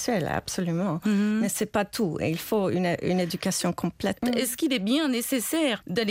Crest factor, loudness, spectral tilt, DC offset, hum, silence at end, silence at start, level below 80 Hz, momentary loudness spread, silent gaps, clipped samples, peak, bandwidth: 14 dB; -26 LUFS; -4.5 dB/octave; under 0.1%; none; 0 s; 0 s; -56 dBFS; 4 LU; none; under 0.1%; -12 dBFS; 16 kHz